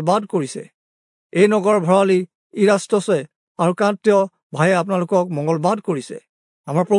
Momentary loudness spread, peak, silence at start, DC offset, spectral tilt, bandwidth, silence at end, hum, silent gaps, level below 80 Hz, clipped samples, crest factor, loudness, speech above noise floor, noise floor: 11 LU; -2 dBFS; 0 s; under 0.1%; -6 dB/octave; 11 kHz; 0 s; none; 0.74-1.30 s, 2.35-2.50 s, 3.36-3.55 s, 4.43-4.50 s, 6.29-6.64 s; -74 dBFS; under 0.1%; 16 dB; -18 LUFS; over 73 dB; under -90 dBFS